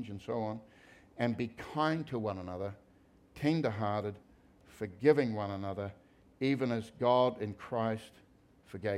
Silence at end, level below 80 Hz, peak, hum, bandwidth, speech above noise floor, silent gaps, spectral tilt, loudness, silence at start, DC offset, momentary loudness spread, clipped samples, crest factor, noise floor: 0 s; -68 dBFS; -12 dBFS; none; 14 kHz; 30 dB; none; -7.5 dB/octave; -34 LUFS; 0 s; under 0.1%; 15 LU; under 0.1%; 22 dB; -64 dBFS